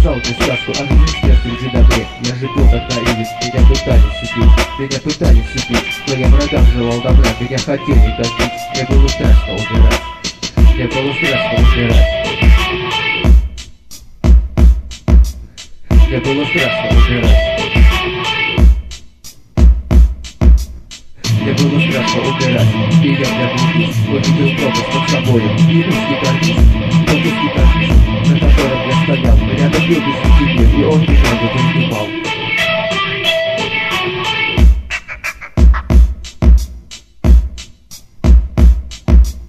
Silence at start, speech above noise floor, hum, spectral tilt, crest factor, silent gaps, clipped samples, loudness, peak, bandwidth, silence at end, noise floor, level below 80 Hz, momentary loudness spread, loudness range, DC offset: 0 s; 25 dB; none; -5.5 dB/octave; 12 dB; none; under 0.1%; -13 LUFS; 0 dBFS; 12.5 kHz; 0 s; -36 dBFS; -14 dBFS; 7 LU; 2 LU; under 0.1%